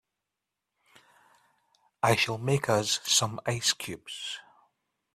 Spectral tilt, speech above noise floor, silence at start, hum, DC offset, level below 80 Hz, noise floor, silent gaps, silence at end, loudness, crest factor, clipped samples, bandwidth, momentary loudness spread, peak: -3 dB/octave; 58 dB; 2.05 s; none; under 0.1%; -66 dBFS; -87 dBFS; none; 0.75 s; -27 LUFS; 22 dB; under 0.1%; 15.5 kHz; 13 LU; -10 dBFS